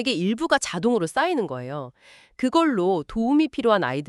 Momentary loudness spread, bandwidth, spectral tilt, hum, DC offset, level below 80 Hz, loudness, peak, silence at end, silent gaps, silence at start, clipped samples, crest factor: 10 LU; 12 kHz; -5 dB/octave; none; under 0.1%; -54 dBFS; -23 LUFS; -4 dBFS; 0 s; none; 0 s; under 0.1%; 18 dB